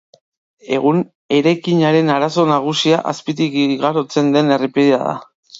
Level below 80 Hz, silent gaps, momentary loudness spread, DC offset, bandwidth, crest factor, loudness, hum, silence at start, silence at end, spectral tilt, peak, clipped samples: -66 dBFS; 1.15-1.29 s, 5.35-5.43 s; 6 LU; under 0.1%; 7.8 kHz; 14 dB; -16 LUFS; none; 0.65 s; 0 s; -6 dB/octave; 0 dBFS; under 0.1%